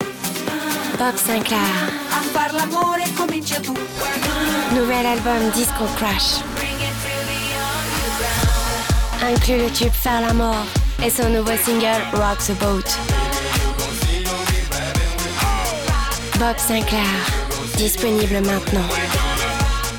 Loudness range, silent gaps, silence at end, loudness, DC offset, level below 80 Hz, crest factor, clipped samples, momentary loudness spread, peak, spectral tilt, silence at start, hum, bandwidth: 2 LU; none; 0 s; -19 LUFS; under 0.1%; -26 dBFS; 10 dB; under 0.1%; 5 LU; -8 dBFS; -3.5 dB/octave; 0 s; none; 19.5 kHz